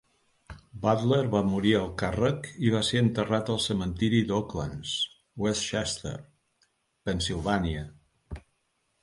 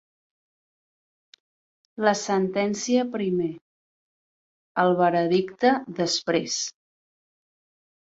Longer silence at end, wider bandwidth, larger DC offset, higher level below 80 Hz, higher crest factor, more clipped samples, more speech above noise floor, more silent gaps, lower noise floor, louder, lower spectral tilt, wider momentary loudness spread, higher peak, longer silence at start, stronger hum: second, 0.65 s vs 1.4 s; first, 11.5 kHz vs 8.2 kHz; neither; first, -48 dBFS vs -70 dBFS; about the same, 20 dB vs 20 dB; neither; second, 47 dB vs over 67 dB; second, none vs 3.61-4.75 s; second, -74 dBFS vs under -90 dBFS; second, -28 LUFS vs -24 LUFS; about the same, -5 dB/octave vs -4.5 dB/octave; first, 14 LU vs 10 LU; about the same, -8 dBFS vs -6 dBFS; second, 0.5 s vs 2 s; neither